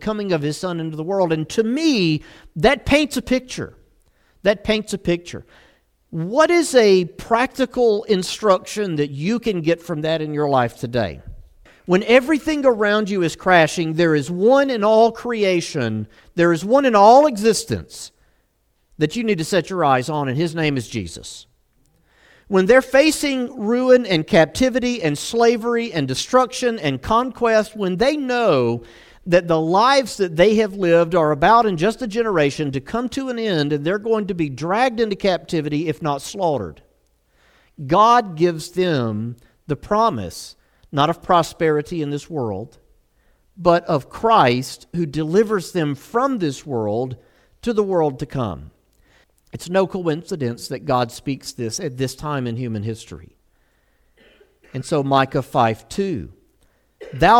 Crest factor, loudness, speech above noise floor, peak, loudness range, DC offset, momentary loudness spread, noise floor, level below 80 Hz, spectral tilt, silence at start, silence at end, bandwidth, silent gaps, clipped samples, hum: 18 dB; -19 LUFS; 46 dB; -2 dBFS; 7 LU; under 0.1%; 13 LU; -65 dBFS; -46 dBFS; -5.5 dB/octave; 0 s; 0 s; 16.5 kHz; none; under 0.1%; none